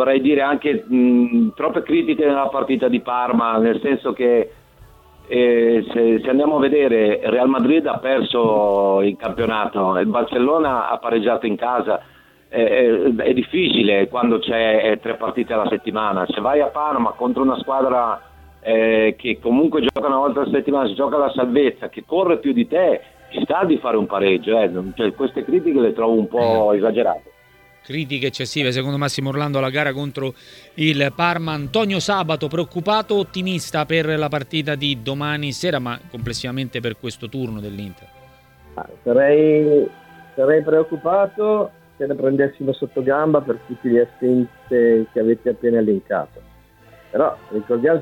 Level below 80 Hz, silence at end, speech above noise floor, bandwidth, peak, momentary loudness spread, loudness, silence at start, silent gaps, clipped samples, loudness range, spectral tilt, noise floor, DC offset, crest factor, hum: -52 dBFS; 0 s; 33 dB; 16.5 kHz; -2 dBFS; 9 LU; -19 LUFS; 0 s; none; under 0.1%; 4 LU; -6 dB/octave; -51 dBFS; under 0.1%; 16 dB; none